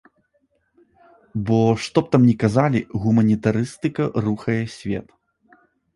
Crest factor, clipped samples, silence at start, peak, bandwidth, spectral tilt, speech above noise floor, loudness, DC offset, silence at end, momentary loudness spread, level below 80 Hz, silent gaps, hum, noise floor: 18 dB; under 0.1%; 1.35 s; -2 dBFS; 11.5 kHz; -7.5 dB/octave; 48 dB; -20 LUFS; under 0.1%; 0.95 s; 12 LU; -50 dBFS; none; none; -67 dBFS